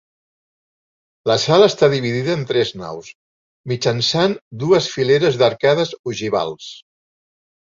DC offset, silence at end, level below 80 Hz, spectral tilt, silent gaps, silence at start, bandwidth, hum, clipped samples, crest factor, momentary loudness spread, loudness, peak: under 0.1%; 0.85 s; -56 dBFS; -5 dB/octave; 3.15-3.64 s, 4.41-4.51 s, 5.99-6.04 s; 1.25 s; 7.6 kHz; none; under 0.1%; 18 dB; 16 LU; -17 LUFS; -2 dBFS